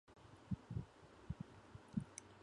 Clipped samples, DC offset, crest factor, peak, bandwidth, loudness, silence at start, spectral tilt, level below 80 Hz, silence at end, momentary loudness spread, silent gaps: under 0.1%; under 0.1%; 22 dB; -28 dBFS; 11 kHz; -51 LUFS; 0.1 s; -6.5 dB/octave; -62 dBFS; 0 s; 15 LU; none